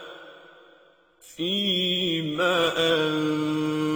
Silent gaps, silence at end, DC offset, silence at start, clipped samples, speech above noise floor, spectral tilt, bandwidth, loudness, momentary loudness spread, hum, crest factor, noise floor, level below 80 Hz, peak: none; 0 s; under 0.1%; 0 s; under 0.1%; 33 dB; -4.5 dB/octave; 19.5 kHz; -24 LUFS; 7 LU; none; 14 dB; -57 dBFS; -64 dBFS; -12 dBFS